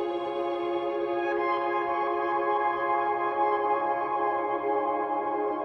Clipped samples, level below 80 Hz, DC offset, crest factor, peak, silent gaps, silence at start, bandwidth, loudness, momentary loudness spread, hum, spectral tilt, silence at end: under 0.1%; -66 dBFS; under 0.1%; 14 dB; -14 dBFS; none; 0 s; 6.2 kHz; -28 LUFS; 3 LU; none; -6.5 dB/octave; 0 s